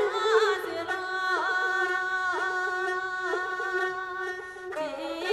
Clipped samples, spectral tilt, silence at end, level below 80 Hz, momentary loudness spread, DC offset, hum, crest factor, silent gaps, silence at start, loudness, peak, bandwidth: under 0.1%; -2 dB/octave; 0 s; -68 dBFS; 10 LU; under 0.1%; none; 18 dB; none; 0 s; -28 LUFS; -10 dBFS; 14 kHz